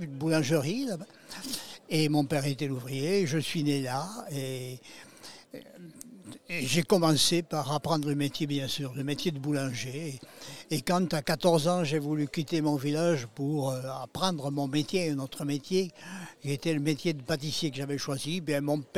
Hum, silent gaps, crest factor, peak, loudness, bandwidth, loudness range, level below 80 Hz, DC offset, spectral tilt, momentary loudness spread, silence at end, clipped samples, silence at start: none; none; 20 dB; -10 dBFS; -30 LUFS; 16.5 kHz; 4 LU; -64 dBFS; 0.2%; -5 dB/octave; 17 LU; 0 s; under 0.1%; 0 s